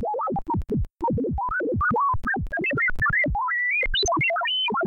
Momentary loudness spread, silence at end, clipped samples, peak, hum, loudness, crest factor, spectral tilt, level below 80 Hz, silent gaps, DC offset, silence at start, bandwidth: 6 LU; 0 s; under 0.1%; -14 dBFS; none; -23 LUFS; 10 dB; -4 dB/octave; -36 dBFS; none; under 0.1%; 0 s; 8.2 kHz